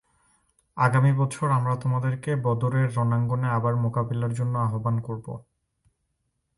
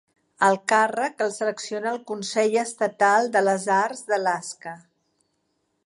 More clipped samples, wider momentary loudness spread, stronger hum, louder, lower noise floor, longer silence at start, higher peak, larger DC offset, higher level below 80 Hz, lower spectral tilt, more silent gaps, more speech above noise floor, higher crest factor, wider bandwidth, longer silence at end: neither; about the same, 8 LU vs 10 LU; neither; about the same, -25 LUFS vs -23 LUFS; about the same, -76 dBFS vs -73 dBFS; first, 0.75 s vs 0.4 s; about the same, -8 dBFS vs -6 dBFS; neither; first, -58 dBFS vs -80 dBFS; first, -8 dB/octave vs -3.5 dB/octave; neither; about the same, 52 dB vs 50 dB; about the same, 18 dB vs 18 dB; about the same, 11.5 kHz vs 11.5 kHz; about the same, 1.15 s vs 1.1 s